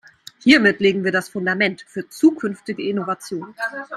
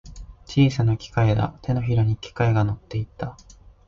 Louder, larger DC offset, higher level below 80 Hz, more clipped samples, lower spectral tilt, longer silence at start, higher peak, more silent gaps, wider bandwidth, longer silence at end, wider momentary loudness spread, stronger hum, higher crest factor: first, -19 LUFS vs -23 LUFS; neither; second, -62 dBFS vs -42 dBFS; neither; second, -5 dB/octave vs -7.5 dB/octave; first, 0.45 s vs 0.05 s; first, 0 dBFS vs -6 dBFS; neither; first, 13.5 kHz vs 7.4 kHz; second, 0 s vs 0.55 s; first, 14 LU vs 11 LU; neither; about the same, 20 dB vs 16 dB